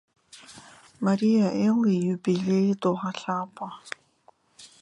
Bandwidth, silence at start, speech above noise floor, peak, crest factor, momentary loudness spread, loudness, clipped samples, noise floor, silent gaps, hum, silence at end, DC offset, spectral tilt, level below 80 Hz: 11 kHz; 0.35 s; 37 dB; -10 dBFS; 16 dB; 19 LU; -25 LUFS; under 0.1%; -61 dBFS; none; none; 0.15 s; under 0.1%; -7 dB/octave; -72 dBFS